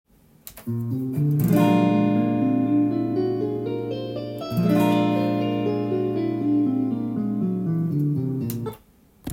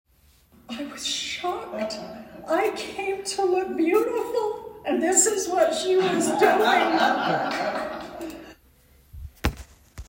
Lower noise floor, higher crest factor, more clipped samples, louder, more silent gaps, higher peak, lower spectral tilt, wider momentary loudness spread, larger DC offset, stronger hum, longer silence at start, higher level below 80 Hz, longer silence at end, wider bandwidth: second, -54 dBFS vs -58 dBFS; about the same, 16 dB vs 20 dB; neither; about the same, -23 LUFS vs -24 LUFS; neither; about the same, -6 dBFS vs -6 dBFS; first, -8 dB/octave vs -3 dB/octave; second, 11 LU vs 17 LU; neither; neither; second, 0.45 s vs 0.7 s; second, -60 dBFS vs -46 dBFS; about the same, 0 s vs 0.05 s; about the same, 16.5 kHz vs 16.5 kHz